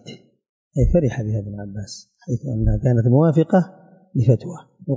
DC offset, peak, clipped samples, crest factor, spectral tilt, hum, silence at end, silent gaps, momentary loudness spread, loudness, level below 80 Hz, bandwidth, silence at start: under 0.1%; -4 dBFS; under 0.1%; 16 dB; -9 dB/octave; none; 0 s; 0.49-0.71 s; 17 LU; -20 LUFS; -32 dBFS; 7.8 kHz; 0.05 s